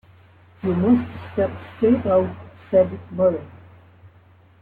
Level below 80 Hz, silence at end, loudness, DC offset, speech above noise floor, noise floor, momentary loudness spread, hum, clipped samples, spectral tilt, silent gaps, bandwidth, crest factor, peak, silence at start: -54 dBFS; 0.55 s; -21 LUFS; under 0.1%; 32 dB; -52 dBFS; 11 LU; none; under 0.1%; -11 dB/octave; none; 4.3 kHz; 16 dB; -6 dBFS; 0.65 s